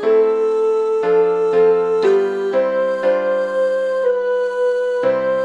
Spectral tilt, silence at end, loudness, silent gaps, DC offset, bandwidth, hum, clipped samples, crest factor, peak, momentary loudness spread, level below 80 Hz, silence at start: -6 dB/octave; 0 s; -17 LUFS; none; under 0.1%; 8.6 kHz; none; under 0.1%; 10 dB; -6 dBFS; 4 LU; -62 dBFS; 0 s